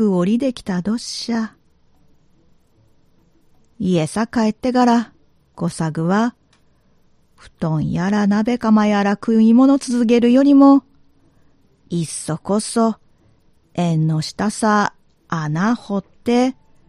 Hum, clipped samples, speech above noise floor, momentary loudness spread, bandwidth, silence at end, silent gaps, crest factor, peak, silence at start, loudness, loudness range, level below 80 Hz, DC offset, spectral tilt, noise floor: none; under 0.1%; 40 dB; 13 LU; 12 kHz; 0.35 s; none; 16 dB; -2 dBFS; 0 s; -17 LUFS; 10 LU; -52 dBFS; under 0.1%; -6 dB/octave; -56 dBFS